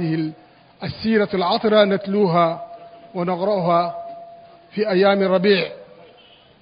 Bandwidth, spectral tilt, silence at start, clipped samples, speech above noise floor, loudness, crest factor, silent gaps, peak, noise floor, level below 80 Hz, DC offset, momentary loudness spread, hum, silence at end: 5.2 kHz; -11 dB/octave; 0 s; under 0.1%; 32 dB; -19 LUFS; 18 dB; none; -2 dBFS; -50 dBFS; -58 dBFS; under 0.1%; 16 LU; none; 0.8 s